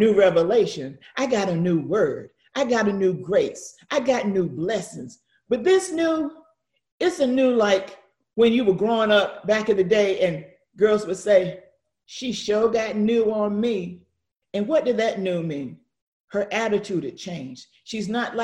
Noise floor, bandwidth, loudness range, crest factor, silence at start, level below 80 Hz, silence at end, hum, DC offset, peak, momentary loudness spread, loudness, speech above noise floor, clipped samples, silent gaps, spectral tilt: -64 dBFS; 12 kHz; 5 LU; 16 dB; 0 s; -62 dBFS; 0 s; none; under 0.1%; -6 dBFS; 15 LU; -22 LUFS; 43 dB; under 0.1%; 6.92-6.98 s, 16.02-16.28 s; -5.5 dB/octave